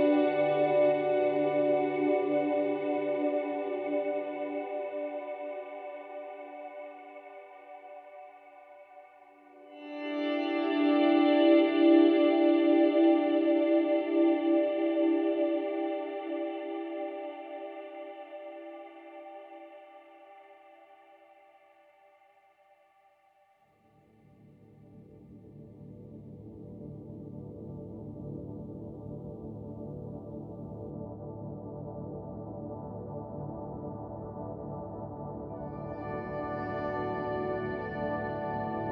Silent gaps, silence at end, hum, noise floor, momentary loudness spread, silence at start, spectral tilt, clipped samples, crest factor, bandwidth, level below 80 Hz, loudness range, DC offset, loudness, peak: none; 0 s; none; -66 dBFS; 23 LU; 0 s; -9.5 dB/octave; under 0.1%; 20 dB; 4.9 kHz; -62 dBFS; 23 LU; under 0.1%; -30 LUFS; -12 dBFS